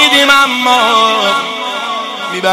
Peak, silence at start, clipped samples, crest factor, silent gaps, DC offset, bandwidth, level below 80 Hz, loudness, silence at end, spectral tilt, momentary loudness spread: 0 dBFS; 0 s; under 0.1%; 12 dB; none; under 0.1%; 17 kHz; -54 dBFS; -10 LUFS; 0 s; -1.5 dB/octave; 11 LU